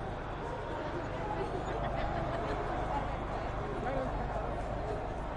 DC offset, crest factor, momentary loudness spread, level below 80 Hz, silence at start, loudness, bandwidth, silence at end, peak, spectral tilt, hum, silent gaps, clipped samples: under 0.1%; 14 dB; 3 LU; -42 dBFS; 0 s; -37 LUFS; 10.5 kHz; 0 s; -22 dBFS; -7 dB/octave; none; none; under 0.1%